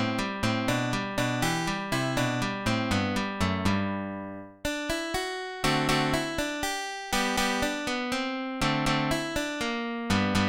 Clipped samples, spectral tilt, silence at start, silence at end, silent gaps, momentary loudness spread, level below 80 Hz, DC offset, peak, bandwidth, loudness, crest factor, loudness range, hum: under 0.1%; -4.5 dB/octave; 0 s; 0 s; none; 6 LU; -46 dBFS; 0.1%; -12 dBFS; 17 kHz; -28 LUFS; 16 dB; 1 LU; none